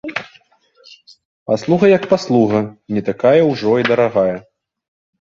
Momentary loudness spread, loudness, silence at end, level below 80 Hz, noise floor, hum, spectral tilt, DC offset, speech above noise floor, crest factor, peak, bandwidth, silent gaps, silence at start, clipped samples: 12 LU; -15 LUFS; 0.8 s; -56 dBFS; -53 dBFS; none; -7 dB/octave; under 0.1%; 39 dB; 16 dB; 0 dBFS; 7.6 kHz; 1.25-1.46 s; 0.05 s; under 0.1%